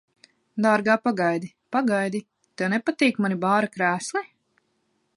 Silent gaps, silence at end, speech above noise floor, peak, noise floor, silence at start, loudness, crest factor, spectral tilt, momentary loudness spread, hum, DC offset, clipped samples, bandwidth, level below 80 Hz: none; 0.9 s; 48 dB; -6 dBFS; -71 dBFS; 0.55 s; -24 LUFS; 20 dB; -5.5 dB/octave; 10 LU; none; under 0.1%; under 0.1%; 11.5 kHz; -74 dBFS